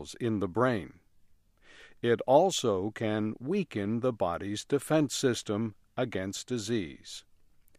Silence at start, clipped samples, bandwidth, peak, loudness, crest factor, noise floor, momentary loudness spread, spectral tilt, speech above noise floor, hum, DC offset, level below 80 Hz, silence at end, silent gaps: 0 s; under 0.1%; 15 kHz; -10 dBFS; -30 LUFS; 20 dB; -61 dBFS; 11 LU; -5 dB/octave; 32 dB; none; under 0.1%; -64 dBFS; 0.6 s; none